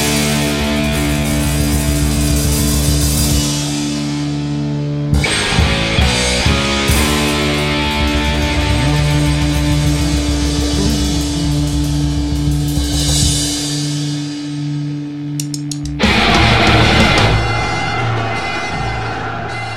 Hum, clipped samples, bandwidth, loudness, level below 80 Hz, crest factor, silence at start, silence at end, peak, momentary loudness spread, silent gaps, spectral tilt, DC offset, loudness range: none; under 0.1%; 16.5 kHz; -15 LUFS; -22 dBFS; 14 dB; 0 s; 0 s; 0 dBFS; 10 LU; none; -4 dB/octave; under 0.1%; 4 LU